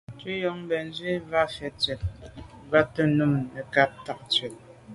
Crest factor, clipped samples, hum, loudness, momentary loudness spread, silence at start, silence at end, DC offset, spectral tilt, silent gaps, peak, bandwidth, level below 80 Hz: 22 dB; under 0.1%; none; -26 LUFS; 14 LU; 0.1 s; 0 s; under 0.1%; -6 dB/octave; none; -4 dBFS; 11.5 kHz; -48 dBFS